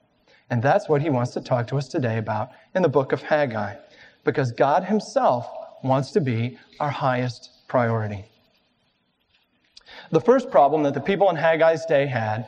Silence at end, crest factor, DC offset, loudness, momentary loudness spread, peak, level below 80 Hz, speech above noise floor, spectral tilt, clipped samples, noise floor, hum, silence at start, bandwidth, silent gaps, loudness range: 0 s; 18 dB; under 0.1%; -22 LUFS; 11 LU; -4 dBFS; -64 dBFS; 47 dB; -7 dB/octave; under 0.1%; -68 dBFS; none; 0.5 s; 9.2 kHz; none; 6 LU